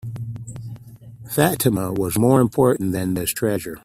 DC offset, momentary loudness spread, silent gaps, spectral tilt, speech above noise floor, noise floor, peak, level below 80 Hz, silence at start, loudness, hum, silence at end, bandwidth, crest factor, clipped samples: under 0.1%; 18 LU; none; -6 dB/octave; 21 dB; -41 dBFS; 0 dBFS; -50 dBFS; 0.05 s; -20 LUFS; none; 0.05 s; 16 kHz; 20 dB; under 0.1%